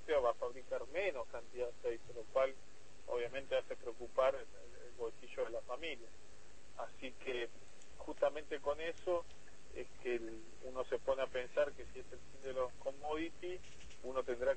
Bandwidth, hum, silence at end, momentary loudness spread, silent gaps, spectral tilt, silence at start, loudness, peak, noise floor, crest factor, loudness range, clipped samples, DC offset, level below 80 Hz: 8.4 kHz; none; 0 s; 19 LU; none; -4.5 dB/octave; 0 s; -42 LUFS; -20 dBFS; -63 dBFS; 20 dB; 4 LU; under 0.1%; 0.5%; -64 dBFS